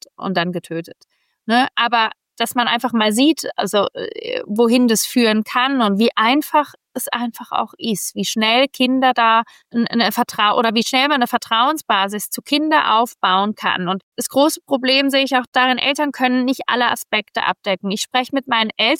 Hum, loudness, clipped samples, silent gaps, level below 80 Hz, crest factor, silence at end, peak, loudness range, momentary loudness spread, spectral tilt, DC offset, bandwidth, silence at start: none; -17 LUFS; under 0.1%; 14.03-14.12 s, 15.47-15.52 s; -70 dBFS; 14 dB; 0 s; -4 dBFS; 2 LU; 8 LU; -3 dB/octave; under 0.1%; 17 kHz; 0.2 s